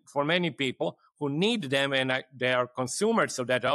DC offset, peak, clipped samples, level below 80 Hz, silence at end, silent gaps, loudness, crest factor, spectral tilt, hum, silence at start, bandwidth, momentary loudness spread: under 0.1%; -12 dBFS; under 0.1%; -74 dBFS; 0 s; none; -28 LUFS; 16 dB; -4 dB/octave; none; 0.1 s; 13.5 kHz; 7 LU